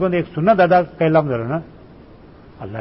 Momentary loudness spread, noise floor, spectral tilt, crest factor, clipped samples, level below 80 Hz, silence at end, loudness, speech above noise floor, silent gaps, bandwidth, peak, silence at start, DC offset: 15 LU; -43 dBFS; -12 dB/octave; 16 dB; under 0.1%; -48 dBFS; 0 s; -17 LUFS; 27 dB; none; 5.8 kHz; -4 dBFS; 0 s; 0.1%